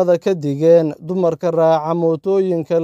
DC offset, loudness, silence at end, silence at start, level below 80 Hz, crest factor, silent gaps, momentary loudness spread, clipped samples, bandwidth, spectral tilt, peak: under 0.1%; -16 LUFS; 0 s; 0 s; -66 dBFS; 14 dB; none; 6 LU; under 0.1%; 7.6 kHz; -8 dB/octave; -2 dBFS